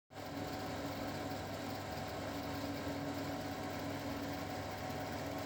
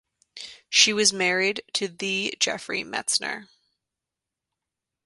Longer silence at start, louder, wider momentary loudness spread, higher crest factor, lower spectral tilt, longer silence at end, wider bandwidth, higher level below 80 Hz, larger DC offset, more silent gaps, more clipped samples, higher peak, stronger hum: second, 0.1 s vs 0.35 s; second, -42 LUFS vs -23 LUFS; second, 2 LU vs 18 LU; second, 14 dB vs 26 dB; first, -5 dB/octave vs -1 dB/octave; second, 0 s vs 1.6 s; first, over 20 kHz vs 11.5 kHz; first, -62 dBFS vs -72 dBFS; neither; neither; neither; second, -28 dBFS vs -2 dBFS; neither